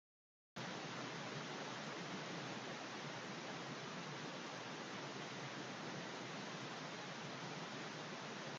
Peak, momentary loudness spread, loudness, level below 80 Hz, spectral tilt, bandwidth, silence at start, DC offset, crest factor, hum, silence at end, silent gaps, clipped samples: -34 dBFS; 1 LU; -48 LUFS; -88 dBFS; -3.5 dB/octave; 10 kHz; 0.55 s; under 0.1%; 14 dB; none; 0 s; none; under 0.1%